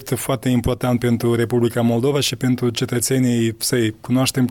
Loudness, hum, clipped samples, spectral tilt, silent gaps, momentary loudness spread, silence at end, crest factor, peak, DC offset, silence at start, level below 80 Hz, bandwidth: -19 LUFS; none; under 0.1%; -5 dB/octave; none; 3 LU; 0 s; 16 dB; -4 dBFS; under 0.1%; 0 s; -44 dBFS; 18 kHz